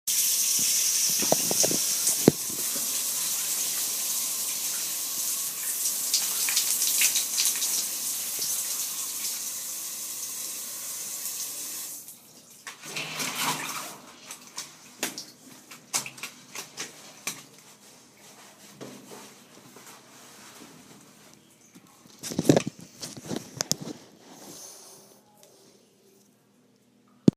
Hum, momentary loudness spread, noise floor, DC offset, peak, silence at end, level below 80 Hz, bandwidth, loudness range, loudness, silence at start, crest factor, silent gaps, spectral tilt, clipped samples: none; 23 LU; -62 dBFS; under 0.1%; 0 dBFS; 0.05 s; -70 dBFS; 15.5 kHz; 19 LU; -26 LUFS; 0.05 s; 30 dB; none; -2 dB/octave; under 0.1%